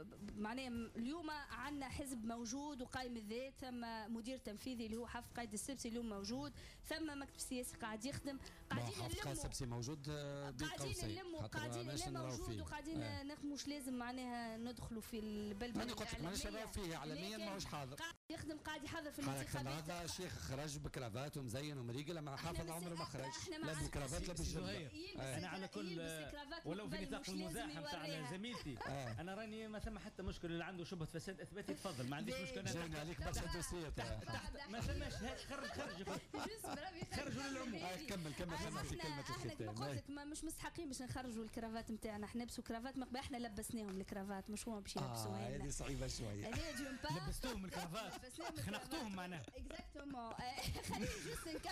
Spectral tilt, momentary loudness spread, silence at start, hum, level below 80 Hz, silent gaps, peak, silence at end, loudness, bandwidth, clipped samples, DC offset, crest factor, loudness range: -4.5 dB/octave; 4 LU; 0 s; none; -58 dBFS; 18.17-18.29 s; -34 dBFS; 0 s; -47 LUFS; 15.5 kHz; under 0.1%; under 0.1%; 12 dB; 2 LU